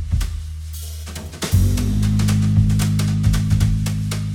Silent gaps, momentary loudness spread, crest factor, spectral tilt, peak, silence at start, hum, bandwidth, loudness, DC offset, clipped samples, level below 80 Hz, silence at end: none; 14 LU; 14 dB; -6 dB/octave; -4 dBFS; 0 s; none; 17 kHz; -19 LUFS; under 0.1%; under 0.1%; -24 dBFS; 0 s